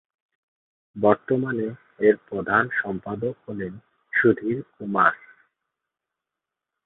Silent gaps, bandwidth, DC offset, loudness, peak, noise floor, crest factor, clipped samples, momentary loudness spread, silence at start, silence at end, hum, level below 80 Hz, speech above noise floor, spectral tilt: none; 4 kHz; under 0.1%; -23 LUFS; -2 dBFS; -87 dBFS; 22 dB; under 0.1%; 13 LU; 0.95 s; 1.7 s; none; -62 dBFS; 63 dB; -11 dB/octave